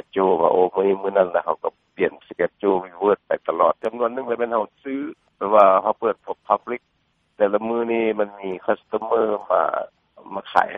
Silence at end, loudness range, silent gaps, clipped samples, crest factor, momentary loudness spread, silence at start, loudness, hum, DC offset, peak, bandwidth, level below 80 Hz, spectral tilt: 0 s; 3 LU; none; under 0.1%; 22 dB; 12 LU; 0.15 s; -21 LUFS; none; under 0.1%; 0 dBFS; 5.8 kHz; -64 dBFS; -7.5 dB/octave